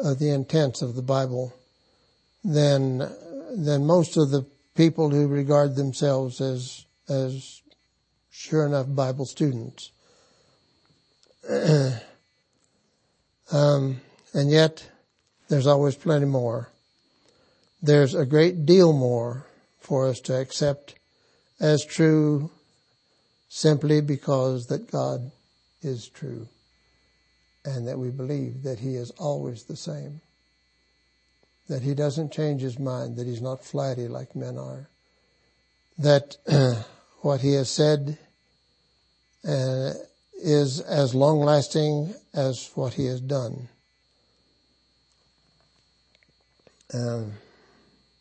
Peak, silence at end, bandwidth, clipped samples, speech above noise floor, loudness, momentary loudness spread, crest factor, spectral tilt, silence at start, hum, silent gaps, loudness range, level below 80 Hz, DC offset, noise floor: -4 dBFS; 0.85 s; 8.8 kHz; under 0.1%; 47 dB; -24 LUFS; 17 LU; 22 dB; -6.5 dB/octave; 0 s; none; none; 11 LU; -68 dBFS; under 0.1%; -70 dBFS